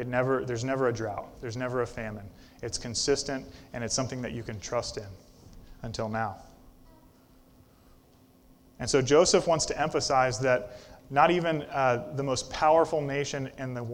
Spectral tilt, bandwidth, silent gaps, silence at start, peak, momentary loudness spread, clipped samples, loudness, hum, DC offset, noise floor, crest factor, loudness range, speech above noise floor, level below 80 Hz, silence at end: -4 dB/octave; 16.5 kHz; none; 0 s; -8 dBFS; 16 LU; under 0.1%; -28 LUFS; none; under 0.1%; -59 dBFS; 22 dB; 14 LU; 31 dB; -52 dBFS; 0 s